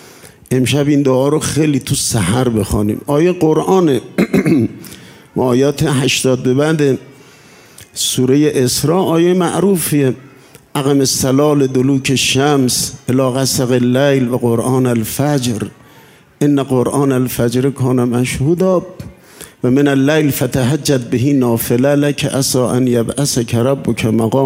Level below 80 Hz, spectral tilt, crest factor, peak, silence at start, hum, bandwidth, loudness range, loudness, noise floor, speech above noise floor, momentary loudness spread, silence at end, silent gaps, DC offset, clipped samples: -42 dBFS; -5 dB/octave; 14 dB; 0 dBFS; 0.25 s; none; 16.5 kHz; 2 LU; -14 LUFS; -44 dBFS; 31 dB; 5 LU; 0 s; none; under 0.1%; under 0.1%